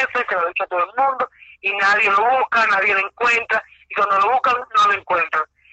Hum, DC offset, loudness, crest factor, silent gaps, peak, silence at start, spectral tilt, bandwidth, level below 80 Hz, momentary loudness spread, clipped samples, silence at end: none; under 0.1%; -18 LUFS; 12 dB; none; -6 dBFS; 0 s; -2 dB/octave; 8.6 kHz; -62 dBFS; 8 LU; under 0.1%; 0.25 s